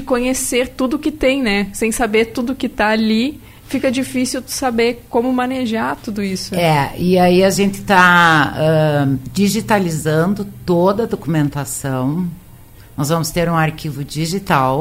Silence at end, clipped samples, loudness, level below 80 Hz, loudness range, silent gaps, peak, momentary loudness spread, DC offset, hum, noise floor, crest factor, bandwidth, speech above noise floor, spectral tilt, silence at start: 0 s; under 0.1%; -16 LUFS; -40 dBFS; 6 LU; none; 0 dBFS; 9 LU; under 0.1%; none; -40 dBFS; 16 dB; 16 kHz; 24 dB; -5 dB/octave; 0 s